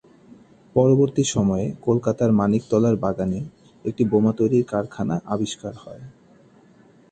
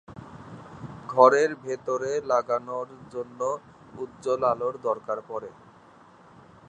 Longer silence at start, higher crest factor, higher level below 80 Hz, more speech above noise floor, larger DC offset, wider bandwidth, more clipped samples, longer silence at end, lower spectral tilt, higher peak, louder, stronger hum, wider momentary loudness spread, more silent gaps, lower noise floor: first, 0.75 s vs 0.1 s; second, 18 dB vs 24 dB; first, -52 dBFS vs -66 dBFS; first, 32 dB vs 28 dB; neither; about the same, 9 kHz vs 9.4 kHz; neither; second, 1 s vs 1.2 s; first, -7 dB/octave vs -5 dB/octave; about the same, -4 dBFS vs -4 dBFS; first, -21 LUFS vs -26 LUFS; neither; second, 14 LU vs 25 LU; neither; about the same, -53 dBFS vs -53 dBFS